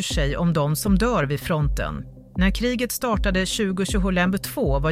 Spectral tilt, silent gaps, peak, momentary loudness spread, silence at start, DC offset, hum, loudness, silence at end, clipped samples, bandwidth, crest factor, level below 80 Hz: -5 dB/octave; none; -8 dBFS; 4 LU; 0 s; under 0.1%; none; -23 LUFS; 0 s; under 0.1%; 16 kHz; 14 dB; -30 dBFS